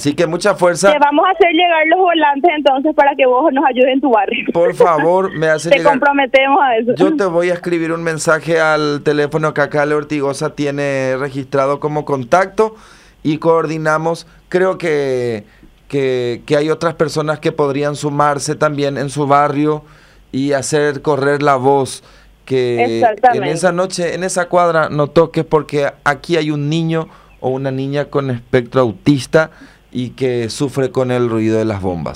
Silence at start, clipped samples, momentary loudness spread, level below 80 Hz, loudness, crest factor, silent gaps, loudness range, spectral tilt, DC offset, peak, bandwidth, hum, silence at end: 0 s; under 0.1%; 8 LU; -50 dBFS; -14 LUFS; 14 dB; none; 5 LU; -5.5 dB/octave; under 0.1%; 0 dBFS; 15 kHz; none; 0 s